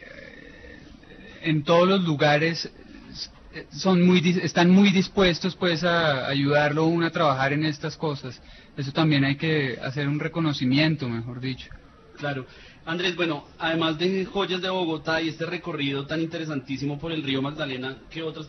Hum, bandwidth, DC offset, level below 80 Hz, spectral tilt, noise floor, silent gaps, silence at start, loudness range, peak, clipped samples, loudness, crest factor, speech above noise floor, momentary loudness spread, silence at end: none; 6.4 kHz; under 0.1%; -54 dBFS; -6 dB/octave; -46 dBFS; none; 0 s; 7 LU; -8 dBFS; under 0.1%; -24 LUFS; 16 dB; 22 dB; 17 LU; 0 s